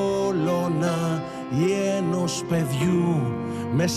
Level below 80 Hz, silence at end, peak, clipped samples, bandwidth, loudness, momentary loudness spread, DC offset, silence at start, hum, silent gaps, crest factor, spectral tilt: -56 dBFS; 0 s; -12 dBFS; under 0.1%; 14.5 kHz; -24 LUFS; 5 LU; under 0.1%; 0 s; none; none; 10 dB; -6 dB/octave